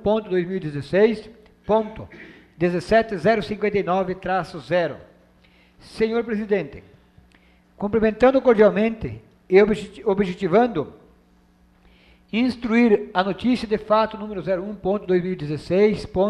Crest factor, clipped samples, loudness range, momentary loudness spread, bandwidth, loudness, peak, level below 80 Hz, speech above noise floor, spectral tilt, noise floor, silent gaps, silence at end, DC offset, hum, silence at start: 20 dB; under 0.1%; 6 LU; 13 LU; 10.5 kHz; -21 LUFS; -2 dBFS; -48 dBFS; 36 dB; -7.5 dB/octave; -56 dBFS; none; 0 s; under 0.1%; none; 0 s